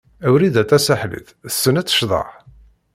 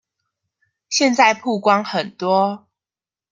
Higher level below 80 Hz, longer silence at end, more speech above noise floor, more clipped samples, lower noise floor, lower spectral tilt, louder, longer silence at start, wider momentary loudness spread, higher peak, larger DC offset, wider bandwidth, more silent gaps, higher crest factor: first, -50 dBFS vs -68 dBFS; about the same, 0.65 s vs 0.75 s; second, 31 dB vs over 73 dB; neither; second, -48 dBFS vs under -90 dBFS; about the same, -4.5 dB/octave vs -3.5 dB/octave; about the same, -16 LUFS vs -18 LUFS; second, 0.2 s vs 0.9 s; first, 13 LU vs 9 LU; about the same, -2 dBFS vs -2 dBFS; neither; first, 16 kHz vs 9.6 kHz; neither; about the same, 16 dB vs 18 dB